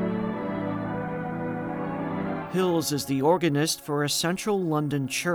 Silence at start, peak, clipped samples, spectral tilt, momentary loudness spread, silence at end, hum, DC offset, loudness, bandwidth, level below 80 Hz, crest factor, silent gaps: 0 s; -8 dBFS; under 0.1%; -4.5 dB/octave; 8 LU; 0 s; none; under 0.1%; -27 LUFS; over 20 kHz; -58 dBFS; 18 dB; none